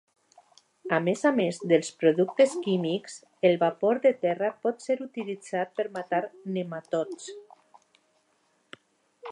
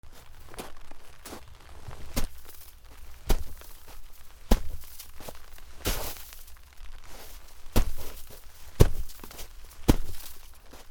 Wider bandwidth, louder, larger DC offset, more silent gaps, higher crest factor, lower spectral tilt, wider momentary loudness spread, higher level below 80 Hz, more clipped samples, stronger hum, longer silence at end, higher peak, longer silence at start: second, 11 kHz vs over 20 kHz; first, -27 LUFS vs -33 LUFS; neither; neither; second, 20 dB vs 30 dB; about the same, -5.5 dB/octave vs -5 dB/octave; second, 12 LU vs 23 LU; second, -82 dBFS vs -34 dBFS; neither; neither; about the same, 0 s vs 0 s; second, -8 dBFS vs 0 dBFS; first, 0.85 s vs 0.05 s